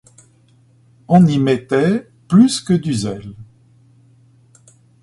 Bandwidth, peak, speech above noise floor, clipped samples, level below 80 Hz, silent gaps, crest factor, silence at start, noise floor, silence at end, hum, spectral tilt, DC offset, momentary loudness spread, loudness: 11.5 kHz; 0 dBFS; 38 dB; under 0.1%; -52 dBFS; none; 18 dB; 1.1 s; -52 dBFS; 1.6 s; none; -6.5 dB/octave; under 0.1%; 12 LU; -15 LUFS